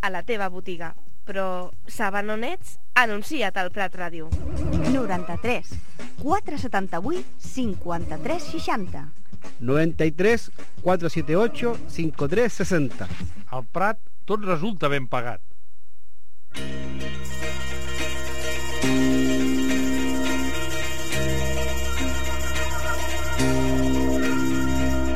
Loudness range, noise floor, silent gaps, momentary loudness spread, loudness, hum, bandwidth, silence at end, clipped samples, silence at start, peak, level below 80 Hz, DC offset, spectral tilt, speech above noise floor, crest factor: 5 LU; -62 dBFS; none; 12 LU; -26 LUFS; none; 16.5 kHz; 0 s; under 0.1%; 0.05 s; -2 dBFS; -36 dBFS; 9%; -5 dB/octave; 37 dB; 24 dB